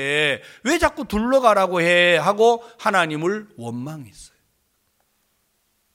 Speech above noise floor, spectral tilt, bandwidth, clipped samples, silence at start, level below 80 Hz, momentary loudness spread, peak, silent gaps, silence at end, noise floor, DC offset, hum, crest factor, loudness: 48 dB; -4 dB/octave; 16.5 kHz; under 0.1%; 0 s; -46 dBFS; 16 LU; -2 dBFS; none; 1.7 s; -68 dBFS; under 0.1%; none; 20 dB; -19 LUFS